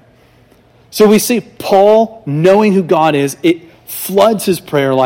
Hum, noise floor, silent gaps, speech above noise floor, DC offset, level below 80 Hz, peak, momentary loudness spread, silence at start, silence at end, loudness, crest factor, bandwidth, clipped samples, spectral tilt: none; -47 dBFS; none; 36 dB; under 0.1%; -54 dBFS; 0 dBFS; 8 LU; 0.95 s; 0 s; -12 LUFS; 12 dB; 17.5 kHz; 0.2%; -5.5 dB/octave